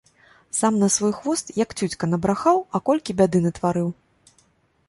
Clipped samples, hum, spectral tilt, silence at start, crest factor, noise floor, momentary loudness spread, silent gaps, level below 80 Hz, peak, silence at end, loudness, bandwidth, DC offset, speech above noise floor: under 0.1%; none; -5.5 dB/octave; 0.55 s; 18 dB; -62 dBFS; 7 LU; none; -54 dBFS; -4 dBFS; 0.95 s; -22 LUFS; 11.5 kHz; under 0.1%; 41 dB